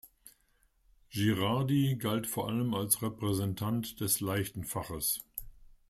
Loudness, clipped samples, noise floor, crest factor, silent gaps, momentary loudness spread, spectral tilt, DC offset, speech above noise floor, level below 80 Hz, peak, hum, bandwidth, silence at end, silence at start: -32 LUFS; under 0.1%; -70 dBFS; 20 dB; none; 8 LU; -4.5 dB/octave; under 0.1%; 39 dB; -58 dBFS; -12 dBFS; none; 16 kHz; 0.2 s; 0.05 s